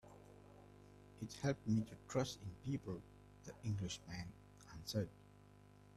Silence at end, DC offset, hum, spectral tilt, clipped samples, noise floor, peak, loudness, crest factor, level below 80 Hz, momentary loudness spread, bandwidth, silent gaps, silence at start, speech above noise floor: 0 s; under 0.1%; 50 Hz at -60 dBFS; -6 dB/octave; under 0.1%; -64 dBFS; -26 dBFS; -45 LUFS; 20 dB; -68 dBFS; 22 LU; 13.5 kHz; none; 0.05 s; 21 dB